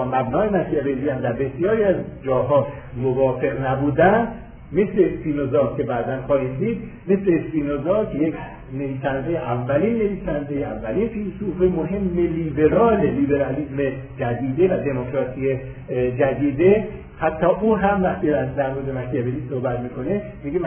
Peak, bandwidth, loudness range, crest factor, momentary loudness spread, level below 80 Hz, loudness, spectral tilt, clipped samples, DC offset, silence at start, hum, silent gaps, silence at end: -4 dBFS; 3.5 kHz; 3 LU; 16 dB; 9 LU; -42 dBFS; -21 LUFS; -12 dB/octave; under 0.1%; under 0.1%; 0 s; none; none; 0 s